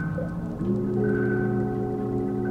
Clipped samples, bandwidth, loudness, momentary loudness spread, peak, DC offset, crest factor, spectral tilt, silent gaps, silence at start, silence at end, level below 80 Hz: under 0.1%; 5.8 kHz; -27 LUFS; 6 LU; -14 dBFS; under 0.1%; 12 dB; -10.5 dB/octave; none; 0 s; 0 s; -46 dBFS